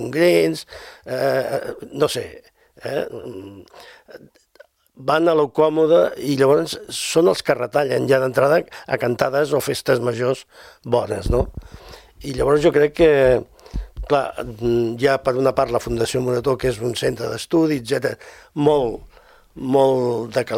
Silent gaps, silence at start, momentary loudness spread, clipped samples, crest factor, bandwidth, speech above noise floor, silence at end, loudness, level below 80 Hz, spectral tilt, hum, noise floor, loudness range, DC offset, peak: none; 0 s; 15 LU; under 0.1%; 20 dB; 16.5 kHz; 32 dB; 0 s; -19 LUFS; -40 dBFS; -5.5 dB/octave; none; -52 dBFS; 7 LU; under 0.1%; 0 dBFS